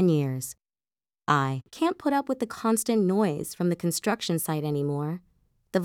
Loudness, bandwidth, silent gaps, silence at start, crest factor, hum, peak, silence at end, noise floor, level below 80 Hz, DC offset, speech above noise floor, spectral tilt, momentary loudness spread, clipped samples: -27 LUFS; 17.5 kHz; none; 0 s; 20 dB; none; -8 dBFS; 0 s; under -90 dBFS; -68 dBFS; under 0.1%; over 64 dB; -5.5 dB/octave; 8 LU; under 0.1%